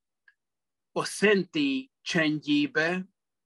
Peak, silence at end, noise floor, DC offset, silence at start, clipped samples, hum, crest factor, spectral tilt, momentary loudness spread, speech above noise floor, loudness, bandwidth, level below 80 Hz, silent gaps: -8 dBFS; 0.4 s; under -90 dBFS; under 0.1%; 0.95 s; under 0.1%; none; 20 dB; -4.5 dB/octave; 11 LU; over 63 dB; -27 LUFS; 12.5 kHz; -76 dBFS; none